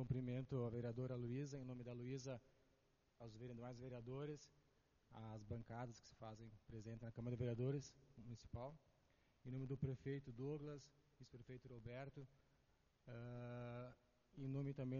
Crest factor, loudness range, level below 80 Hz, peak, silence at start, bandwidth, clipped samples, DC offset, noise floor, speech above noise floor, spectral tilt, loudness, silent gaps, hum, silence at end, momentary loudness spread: 20 dB; 6 LU; -72 dBFS; -32 dBFS; 0 s; 7 kHz; under 0.1%; under 0.1%; -81 dBFS; 30 dB; -8 dB/octave; -52 LUFS; none; none; 0 s; 15 LU